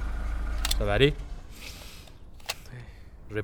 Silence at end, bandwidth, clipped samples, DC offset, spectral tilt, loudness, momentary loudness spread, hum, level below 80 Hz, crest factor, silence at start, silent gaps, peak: 0 s; over 20 kHz; under 0.1%; under 0.1%; -4.5 dB/octave; -29 LUFS; 24 LU; none; -34 dBFS; 24 dB; 0 s; none; -6 dBFS